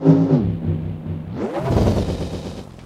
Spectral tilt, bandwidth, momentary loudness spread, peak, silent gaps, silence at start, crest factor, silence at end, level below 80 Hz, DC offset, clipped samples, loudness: -8.5 dB/octave; 11 kHz; 13 LU; -2 dBFS; none; 0 s; 16 dB; 0 s; -32 dBFS; under 0.1%; under 0.1%; -21 LUFS